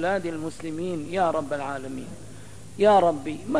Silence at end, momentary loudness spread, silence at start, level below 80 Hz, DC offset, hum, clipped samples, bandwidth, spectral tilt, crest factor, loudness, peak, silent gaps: 0 s; 24 LU; 0 s; -54 dBFS; 0.8%; none; under 0.1%; 11 kHz; -6 dB/octave; 18 dB; -25 LUFS; -8 dBFS; none